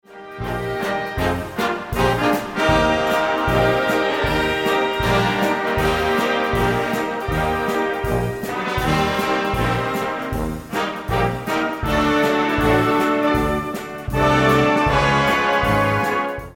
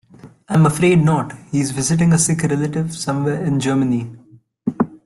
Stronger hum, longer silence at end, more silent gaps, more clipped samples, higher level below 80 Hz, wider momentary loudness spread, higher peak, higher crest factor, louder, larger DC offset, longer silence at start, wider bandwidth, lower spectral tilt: neither; about the same, 0 s vs 0.1 s; neither; neither; first, -34 dBFS vs -50 dBFS; about the same, 8 LU vs 9 LU; about the same, -4 dBFS vs -4 dBFS; about the same, 16 dB vs 14 dB; about the same, -19 LUFS vs -18 LUFS; neither; second, 0.1 s vs 0.25 s; first, 17 kHz vs 12.5 kHz; about the same, -5.5 dB/octave vs -6 dB/octave